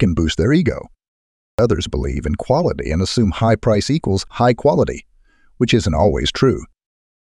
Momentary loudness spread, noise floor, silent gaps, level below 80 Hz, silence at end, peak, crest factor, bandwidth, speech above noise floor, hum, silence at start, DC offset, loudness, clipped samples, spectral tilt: 7 LU; -52 dBFS; 1.08-1.58 s; -32 dBFS; 0.6 s; -2 dBFS; 16 dB; 11.5 kHz; 36 dB; none; 0 s; under 0.1%; -17 LUFS; under 0.1%; -6 dB/octave